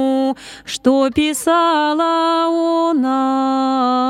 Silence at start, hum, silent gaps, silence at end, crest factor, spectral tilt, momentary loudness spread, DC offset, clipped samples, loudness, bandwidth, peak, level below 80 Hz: 0 s; none; none; 0 s; 14 dB; -3.5 dB/octave; 4 LU; under 0.1%; under 0.1%; -16 LUFS; 15.5 kHz; -2 dBFS; -52 dBFS